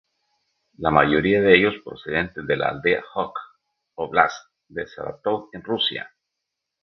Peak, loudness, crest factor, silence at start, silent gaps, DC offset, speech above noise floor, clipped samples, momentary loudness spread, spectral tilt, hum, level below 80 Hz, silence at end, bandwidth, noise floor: 0 dBFS; -21 LUFS; 22 dB; 0.8 s; none; under 0.1%; 61 dB; under 0.1%; 18 LU; -6 dB/octave; none; -52 dBFS; 0.75 s; 6.4 kHz; -82 dBFS